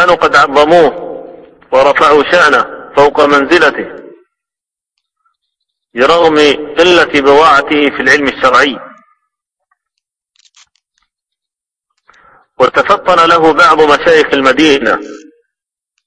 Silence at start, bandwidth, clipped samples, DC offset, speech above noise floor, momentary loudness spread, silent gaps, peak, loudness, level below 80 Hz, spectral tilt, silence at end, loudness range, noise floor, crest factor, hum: 0 s; 11 kHz; 1%; under 0.1%; 78 dB; 8 LU; none; 0 dBFS; -8 LUFS; -44 dBFS; -4 dB/octave; 0.9 s; 6 LU; -85 dBFS; 10 dB; none